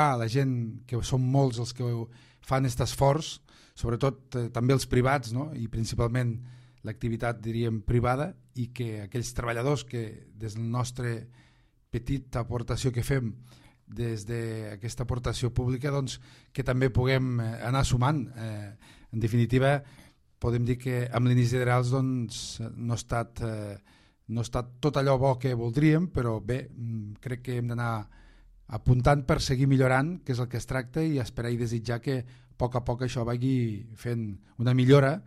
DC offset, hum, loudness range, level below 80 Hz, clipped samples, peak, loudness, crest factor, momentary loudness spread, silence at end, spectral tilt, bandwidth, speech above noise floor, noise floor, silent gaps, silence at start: under 0.1%; none; 6 LU; -44 dBFS; under 0.1%; -8 dBFS; -29 LUFS; 20 dB; 13 LU; 0 s; -6.5 dB/octave; 13 kHz; 35 dB; -62 dBFS; none; 0 s